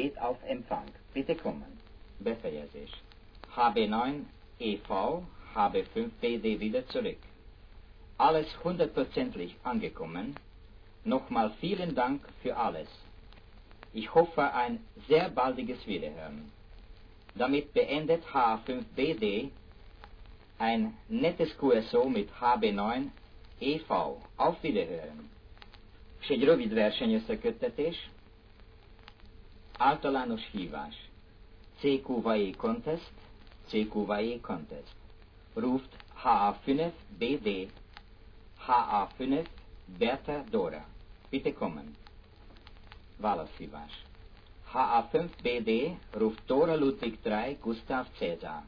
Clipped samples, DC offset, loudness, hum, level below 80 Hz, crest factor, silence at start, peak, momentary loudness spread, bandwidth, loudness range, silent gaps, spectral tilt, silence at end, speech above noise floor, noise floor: under 0.1%; under 0.1%; -32 LUFS; none; -54 dBFS; 22 dB; 0 s; -10 dBFS; 16 LU; 5.4 kHz; 5 LU; none; -8 dB/octave; 0 s; 24 dB; -55 dBFS